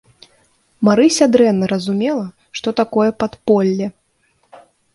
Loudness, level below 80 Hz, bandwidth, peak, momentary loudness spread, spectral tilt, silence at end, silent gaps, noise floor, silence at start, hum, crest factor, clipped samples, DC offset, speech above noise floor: -16 LUFS; -56 dBFS; 11.5 kHz; 0 dBFS; 12 LU; -5.5 dB/octave; 1.05 s; none; -61 dBFS; 0.8 s; none; 16 dB; under 0.1%; under 0.1%; 47 dB